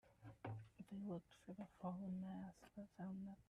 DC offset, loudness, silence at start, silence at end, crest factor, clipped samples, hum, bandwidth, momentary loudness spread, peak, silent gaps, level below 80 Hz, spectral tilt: under 0.1%; -54 LUFS; 0.05 s; 0.05 s; 16 dB; under 0.1%; none; 11 kHz; 10 LU; -36 dBFS; none; -78 dBFS; -8.5 dB/octave